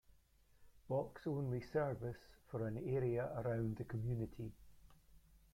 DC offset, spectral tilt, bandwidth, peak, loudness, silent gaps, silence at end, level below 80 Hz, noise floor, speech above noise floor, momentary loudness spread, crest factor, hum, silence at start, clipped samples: under 0.1%; -9 dB/octave; 15.5 kHz; -26 dBFS; -43 LUFS; none; 0.15 s; -64 dBFS; -70 dBFS; 29 dB; 10 LU; 16 dB; none; 0.6 s; under 0.1%